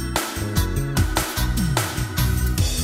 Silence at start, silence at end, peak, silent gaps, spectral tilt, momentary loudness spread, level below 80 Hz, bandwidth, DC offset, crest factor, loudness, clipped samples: 0 s; 0 s; -6 dBFS; none; -4.5 dB/octave; 3 LU; -26 dBFS; 16.5 kHz; under 0.1%; 16 dB; -23 LUFS; under 0.1%